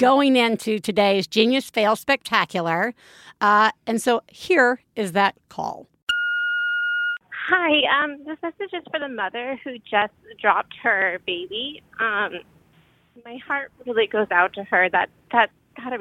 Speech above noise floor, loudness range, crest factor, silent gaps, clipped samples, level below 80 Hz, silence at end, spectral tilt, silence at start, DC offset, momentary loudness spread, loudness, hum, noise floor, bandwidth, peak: 36 dB; 4 LU; 20 dB; 6.03-6.07 s; under 0.1%; -66 dBFS; 0 s; -4 dB/octave; 0 s; under 0.1%; 13 LU; -21 LUFS; none; -58 dBFS; 16.5 kHz; -2 dBFS